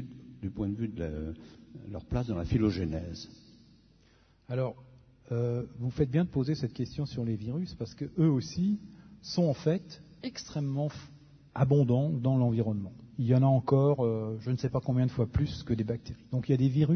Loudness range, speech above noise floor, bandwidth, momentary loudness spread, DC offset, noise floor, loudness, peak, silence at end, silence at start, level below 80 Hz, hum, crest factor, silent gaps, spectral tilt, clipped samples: 7 LU; 34 dB; 6.6 kHz; 16 LU; under 0.1%; -63 dBFS; -31 LUFS; -14 dBFS; 0 s; 0 s; -50 dBFS; none; 18 dB; none; -8.5 dB/octave; under 0.1%